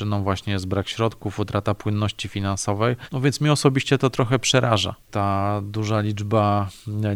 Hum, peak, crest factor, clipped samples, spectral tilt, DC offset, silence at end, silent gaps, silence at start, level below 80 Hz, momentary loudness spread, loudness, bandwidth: none; -2 dBFS; 20 dB; under 0.1%; -5.5 dB/octave; under 0.1%; 0 s; none; 0 s; -50 dBFS; 7 LU; -22 LUFS; 14.5 kHz